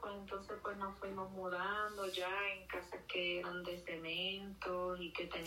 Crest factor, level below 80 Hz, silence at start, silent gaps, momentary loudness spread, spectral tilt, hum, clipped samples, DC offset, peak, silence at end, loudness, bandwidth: 16 dB; -66 dBFS; 0 s; none; 7 LU; -4 dB/octave; none; under 0.1%; under 0.1%; -28 dBFS; 0 s; -42 LUFS; 16 kHz